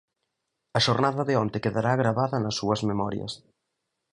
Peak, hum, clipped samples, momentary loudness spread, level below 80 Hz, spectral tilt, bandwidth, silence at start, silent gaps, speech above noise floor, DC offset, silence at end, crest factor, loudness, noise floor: -6 dBFS; none; under 0.1%; 8 LU; -58 dBFS; -5.5 dB/octave; 11 kHz; 0.75 s; none; 55 dB; under 0.1%; 0.75 s; 20 dB; -26 LUFS; -81 dBFS